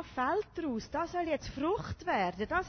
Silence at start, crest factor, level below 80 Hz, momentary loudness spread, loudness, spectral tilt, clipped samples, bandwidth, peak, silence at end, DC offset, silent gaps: 0 s; 16 dB; -54 dBFS; 4 LU; -34 LUFS; -5.5 dB/octave; under 0.1%; 6.6 kHz; -18 dBFS; 0 s; under 0.1%; none